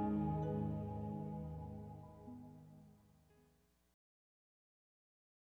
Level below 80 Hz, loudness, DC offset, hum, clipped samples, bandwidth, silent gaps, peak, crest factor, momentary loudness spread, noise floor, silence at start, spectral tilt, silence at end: -62 dBFS; -44 LUFS; under 0.1%; none; under 0.1%; 4 kHz; none; -28 dBFS; 18 dB; 20 LU; -75 dBFS; 0 s; -10.5 dB/octave; 2.5 s